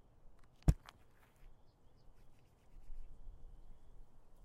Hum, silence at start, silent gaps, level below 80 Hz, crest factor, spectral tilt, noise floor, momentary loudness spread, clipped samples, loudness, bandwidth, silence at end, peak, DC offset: none; 0.15 s; none; -46 dBFS; 28 dB; -7.5 dB/octave; -65 dBFS; 28 LU; under 0.1%; -39 LUFS; 15.5 kHz; 0.05 s; -16 dBFS; under 0.1%